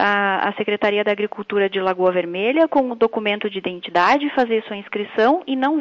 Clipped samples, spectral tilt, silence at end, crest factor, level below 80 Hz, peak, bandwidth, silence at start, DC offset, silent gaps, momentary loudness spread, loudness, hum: under 0.1%; -6 dB/octave; 0 s; 14 dB; -64 dBFS; -6 dBFS; 7.6 kHz; 0 s; under 0.1%; none; 7 LU; -19 LUFS; none